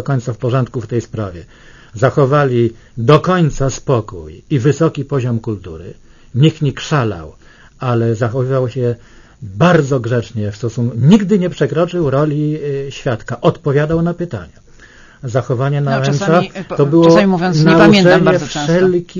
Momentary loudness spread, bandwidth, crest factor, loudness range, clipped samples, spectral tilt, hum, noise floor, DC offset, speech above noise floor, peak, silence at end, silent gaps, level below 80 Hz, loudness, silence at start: 14 LU; 7.4 kHz; 14 dB; 7 LU; 0.1%; -7 dB/octave; none; -41 dBFS; under 0.1%; 27 dB; 0 dBFS; 0 s; none; -40 dBFS; -14 LUFS; 0 s